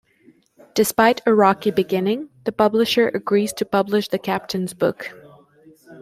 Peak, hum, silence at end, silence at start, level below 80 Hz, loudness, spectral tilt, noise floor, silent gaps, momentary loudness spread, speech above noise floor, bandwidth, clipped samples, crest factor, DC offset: -2 dBFS; none; 0 s; 0.75 s; -60 dBFS; -20 LUFS; -4.5 dB/octave; -55 dBFS; none; 10 LU; 36 dB; 16 kHz; under 0.1%; 18 dB; under 0.1%